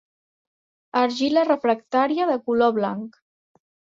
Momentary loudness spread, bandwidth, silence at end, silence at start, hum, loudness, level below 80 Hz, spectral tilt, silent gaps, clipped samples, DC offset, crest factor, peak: 8 LU; 7.8 kHz; 0.9 s; 0.95 s; none; -22 LUFS; -70 dBFS; -5.5 dB/octave; none; under 0.1%; under 0.1%; 16 dB; -6 dBFS